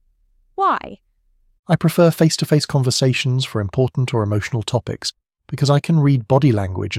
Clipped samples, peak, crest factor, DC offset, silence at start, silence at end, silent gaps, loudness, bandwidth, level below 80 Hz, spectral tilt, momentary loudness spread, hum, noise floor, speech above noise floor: under 0.1%; -2 dBFS; 16 dB; under 0.1%; 0.6 s; 0 s; 1.59-1.63 s; -18 LUFS; 15.5 kHz; -50 dBFS; -6 dB/octave; 10 LU; none; -60 dBFS; 42 dB